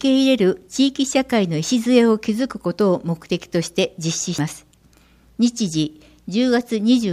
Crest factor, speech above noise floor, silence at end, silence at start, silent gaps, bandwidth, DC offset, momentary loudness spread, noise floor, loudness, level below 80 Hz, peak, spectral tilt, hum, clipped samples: 16 dB; 34 dB; 0 s; 0 s; none; 15 kHz; under 0.1%; 10 LU; -53 dBFS; -20 LUFS; -56 dBFS; -4 dBFS; -5 dB/octave; none; under 0.1%